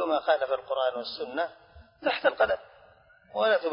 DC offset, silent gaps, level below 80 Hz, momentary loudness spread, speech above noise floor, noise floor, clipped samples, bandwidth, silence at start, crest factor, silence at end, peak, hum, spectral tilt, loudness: under 0.1%; none; -64 dBFS; 9 LU; 30 dB; -58 dBFS; under 0.1%; 5.4 kHz; 0 s; 20 dB; 0 s; -10 dBFS; none; -7 dB/octave; -28 LUFS